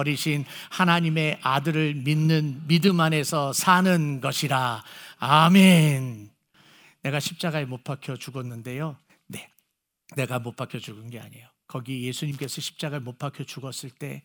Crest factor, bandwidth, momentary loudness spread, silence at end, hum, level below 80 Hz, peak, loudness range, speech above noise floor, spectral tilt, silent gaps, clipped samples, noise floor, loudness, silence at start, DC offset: 22 dB; over 20 kHz; 18 LU; 0.05 s; none; -70 dBFS; -2 dBFS; 14 LU; 53 dB; -5 dB/octave; none; under 0.1%; -77 dBFS; -23 LUFS; 0 s; under 0.1%